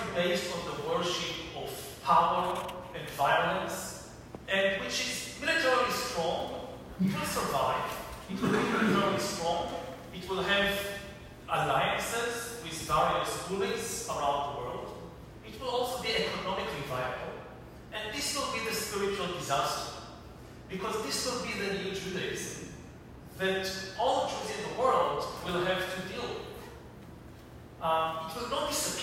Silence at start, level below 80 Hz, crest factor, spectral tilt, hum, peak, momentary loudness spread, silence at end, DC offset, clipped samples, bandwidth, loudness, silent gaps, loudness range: 0 s; -56 dBFS; 20 dB; -3.5 dB/octave; none; -12 dBFS; 18 LU; 0 s; under 0.1%; under 0.1%; 16 kHz; -31 LUFS; none; 4 LU